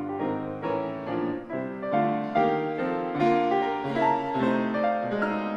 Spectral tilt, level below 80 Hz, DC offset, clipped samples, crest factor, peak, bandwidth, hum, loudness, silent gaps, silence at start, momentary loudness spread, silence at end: -8 dB/octave; -62 dBFS; under 0.1%; under 0.1%; 16 dB; -10 dBFS; 9.2 kHz; none; -27 LUFS; none; 0 s; 7 LU; 0 s